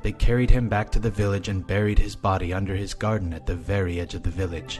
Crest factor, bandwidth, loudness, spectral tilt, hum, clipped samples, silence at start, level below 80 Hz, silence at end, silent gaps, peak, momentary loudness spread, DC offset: 20 dB; 12 kHz; -26 LUFS; -6.5 dB/octave; none; under 0.1%; 0 s; -26 dBFS; 0 s; none; -4 dBFS; 7 LU; under 0.1%